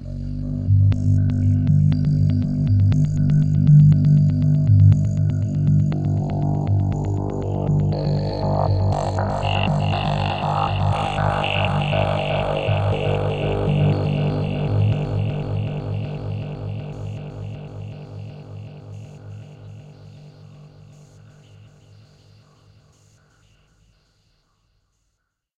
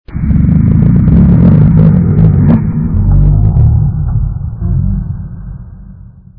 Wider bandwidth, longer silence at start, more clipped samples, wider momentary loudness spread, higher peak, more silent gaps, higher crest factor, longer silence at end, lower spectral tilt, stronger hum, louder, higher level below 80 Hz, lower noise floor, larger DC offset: first, 7.8 kHz vs 2.8 kHz; about the same, 0 s vs 0.1 s; second, under 0.1% vs 0.5%; first, 19 LU vs 14 LU; second, -4 dBFS vs 0 dBFS; neither; first, 18 dB vs 8 dB; first, 4.9 s vs 0.35 s; second, -8.5 dB/octave vs -14 dB/octave; neither; second, -20 LUFS vs -9 LUFS; second, -38 dBFS vs -16 dBFS; first, -74 dBFS vs -32 dBFS; neither